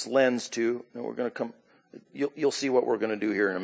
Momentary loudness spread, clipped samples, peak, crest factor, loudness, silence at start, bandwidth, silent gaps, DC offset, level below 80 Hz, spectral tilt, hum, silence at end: 12 LU; under 0.1%; -10 dBFS; 18 dB; -28 LUFS; 0 s; 8 kHz; none; under 0.1%; -78 dBFS; -4 dB/octave; none; 0 s